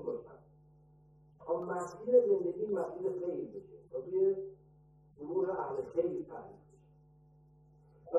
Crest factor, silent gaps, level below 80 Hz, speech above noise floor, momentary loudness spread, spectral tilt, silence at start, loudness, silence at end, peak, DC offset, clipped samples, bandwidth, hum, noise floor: 20 dB; none; -72 dBFS; 29 dB; 21 LU; -8.5 dB/octave; 0 s; -35 LUFS; 0 s; -16 dBFS; under 0.1%; under 0.1%; 8.8 kHz; none; -63 dBFS